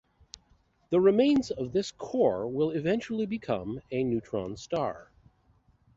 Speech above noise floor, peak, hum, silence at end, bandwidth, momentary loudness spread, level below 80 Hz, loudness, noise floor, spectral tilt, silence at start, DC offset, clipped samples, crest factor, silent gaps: 38 dB; -12 dBFS; none; 0.95 s; 7.8 kHz; 11 LU; -60 dBFS; -29 LUFS; -66 dBFS; -6.5 dB/octave; 0.9 s; under 0.1%; under 0.1%; 18 dB; none